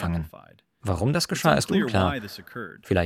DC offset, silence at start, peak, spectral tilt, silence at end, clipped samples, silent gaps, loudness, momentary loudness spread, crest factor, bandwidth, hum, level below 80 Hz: under 0.1%; 0 s; -4 dBFS; -5.5 dB/octave; 0 s; under 0.1%; none; -24 LUFS; 16 LU; 20 dB; 16.5 kHz; none; -50 dBFS